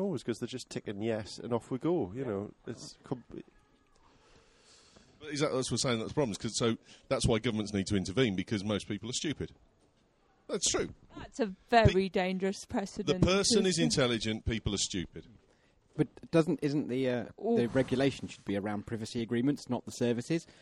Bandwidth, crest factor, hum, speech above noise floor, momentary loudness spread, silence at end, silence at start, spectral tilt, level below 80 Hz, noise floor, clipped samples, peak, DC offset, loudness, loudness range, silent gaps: 12 kHz; 22 dB; none; 37 dB; 13 LU; 0.1 s; 0 s; -4.5 dB/octave; -52 dBFS; -69 dBFS; under 0.1%; -10 dBFS; under 0.1%; -32 LUFS; 8 LU; none